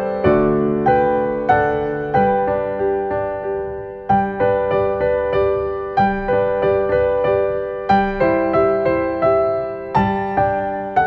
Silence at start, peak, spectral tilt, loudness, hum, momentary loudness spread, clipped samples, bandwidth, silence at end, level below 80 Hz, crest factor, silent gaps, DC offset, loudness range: 0 s; -2 dBFS; -9 dB/octave; -18 LUFS; none; 6 LU; under 0.1%; 5.8 kHz; 0 s; -40 dBFS; 16 dB; none; under 0.1%; 2 LU